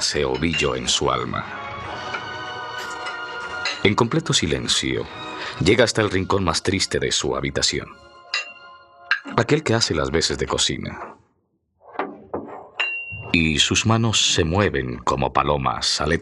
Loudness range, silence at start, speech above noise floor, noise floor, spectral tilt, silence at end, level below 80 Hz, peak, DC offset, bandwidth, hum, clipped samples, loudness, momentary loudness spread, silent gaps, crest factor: 5 LU; 0 s; 47 dB; -68 dBFS; -3.5 dB/octave; 0 s; -42 dBFS; 0 dBFS; under 0.1%; 13 kHz; none; under 0.1%; -21 LUFS; 14 LU; none; 22 dB